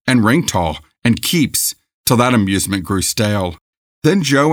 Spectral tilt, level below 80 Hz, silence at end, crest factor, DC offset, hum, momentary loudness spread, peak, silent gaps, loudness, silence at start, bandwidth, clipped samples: -4.5 dB/octave; -42 dBFS; 0 s; 16 dB; under 0.1%; none; 7 LU; 0 dBFS; 1.94-2.04 s, 3.61-4.02 s; -16 LUFS; 0.05 s; over 20 kHz; under 0.1%